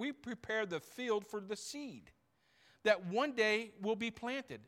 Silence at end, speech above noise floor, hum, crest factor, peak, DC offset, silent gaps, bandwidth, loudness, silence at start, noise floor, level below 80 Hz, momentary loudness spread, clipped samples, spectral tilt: 0.05 s; 35 dB; none; 22 dB; -16 dBFS; under 0.1%; none; 16 kHz; -37 LUFS; 0 s; -73 dBFS; -76 dBFS; 12 LU; under 0.1%; -4 dB/octave